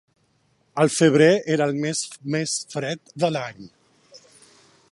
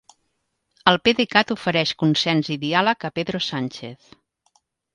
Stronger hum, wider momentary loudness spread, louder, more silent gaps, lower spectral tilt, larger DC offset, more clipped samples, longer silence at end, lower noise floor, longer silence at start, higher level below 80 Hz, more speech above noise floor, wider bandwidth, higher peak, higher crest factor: neither; first, 14 LU vs 10 LU; about the same, -21 LUFS vs -20 LUFS; neither; about the same, -4.5 dB/octave vs -5 dB/octave; neither; neither; second, 0.75 s vs 1 s; second, -65 dBFS vs -73 dBFS; about the same, 0.75 s vs 0.85 s; second, -68 dBFS vs -60 dBFS; second, 44 dB vs 52 dB; about the same, 11.5 kHz vs 11 kHz; second, -4 dBFS vs 0 dBFS; about the same, 20 dB vs 22 dB